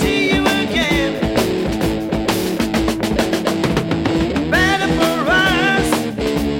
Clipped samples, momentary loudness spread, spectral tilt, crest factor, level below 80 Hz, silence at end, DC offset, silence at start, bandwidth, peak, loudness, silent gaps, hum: under 0.1%; 5 LU; -4.5 dB/octave; 14 dB; -32 dBFS; 0 s; under 0.1%; 0 s; 16.5 kHz; -2 dBFS; -17 LUFS; none; none